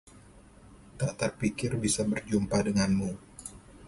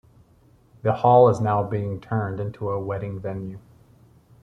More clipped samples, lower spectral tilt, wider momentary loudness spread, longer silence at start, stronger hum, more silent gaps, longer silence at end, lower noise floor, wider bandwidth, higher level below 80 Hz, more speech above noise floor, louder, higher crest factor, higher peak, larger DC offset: neither; second, -5 dB/octave vs -9 dB/octave; about the same, 16 LU vs 16 LU; second, 0.15 s vs 0.85 s; neither; neither; second, 0 s vs 0.85 s; about the same, -54 dBFS vs -56 dBFS; first, 11.5 kHz vs 9.2 kHz; about the same, -52 dBFS vs -56 dBFS; second, 25 dB vs 35 dB; second, -30 LUFS vs -22 LUFS; about the same, 16 dB vs 20 dB; second, -14 dBFS vs -4 dBFS; neither